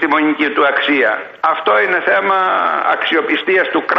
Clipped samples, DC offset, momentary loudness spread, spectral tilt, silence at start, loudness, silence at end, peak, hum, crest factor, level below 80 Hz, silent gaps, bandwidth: under 0.1%; under 0.1%; 3 LU; -5.5 dB/octave; 0 s; -14 LUFS; 0 s; -2 dBFS; none; 12 dB; -64 dBFS; none; 6.2 kHz